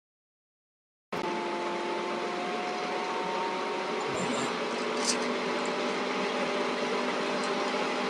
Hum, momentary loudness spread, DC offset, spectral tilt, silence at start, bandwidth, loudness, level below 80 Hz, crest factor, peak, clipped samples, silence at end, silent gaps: none; 3 LU; under 0.1%; -3 dB/octave; 1.1 s; 12.5 kHz; -31 LUFS; -76 dBFS; 22 dB; -10 dBFS; under 0.1%; 0 s; none